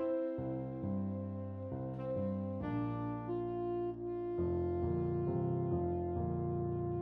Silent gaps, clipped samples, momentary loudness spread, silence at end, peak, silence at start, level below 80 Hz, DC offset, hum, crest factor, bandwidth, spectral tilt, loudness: none; under 0.1%; 5 LU; 0 s; -24 dBFS; 0 s; -56 dBFS; under 0.1%; none; 12 dB; 4 kHz; -12 dB/octave; -38 LUFS